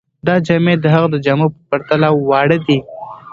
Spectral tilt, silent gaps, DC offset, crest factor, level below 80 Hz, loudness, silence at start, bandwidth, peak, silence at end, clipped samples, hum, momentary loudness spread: -8 dB/octave; none; under 0.1%; 14 dB; -52 dBFS; -14 LUFS; 0.25 s; 7.4 kHz; 0 dBFS; 0.15 s; under 0.1%; none; 6 LU